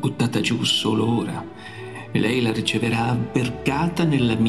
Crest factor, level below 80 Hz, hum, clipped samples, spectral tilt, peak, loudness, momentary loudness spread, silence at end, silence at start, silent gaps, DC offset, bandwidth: 14 dB; -50 dBFS; none; under 0.1%; -5.5 dB/octave; -6 dBFS; -22 LUFS; 13 LU; 0 s; 0 s; none; 0.3%; 13 kHz